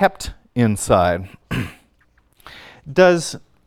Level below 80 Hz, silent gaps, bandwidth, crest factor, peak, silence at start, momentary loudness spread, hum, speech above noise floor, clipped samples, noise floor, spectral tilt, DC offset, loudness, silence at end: -42 dBFS; none; 16 kHz; 20 dB; 0 dBFS; 0 s; 21 LU; none; 42 dB; under 0.1%; -58 dBFS; -5.5 dB/octave; under 0.1%; -19 LUFS; 0.3 s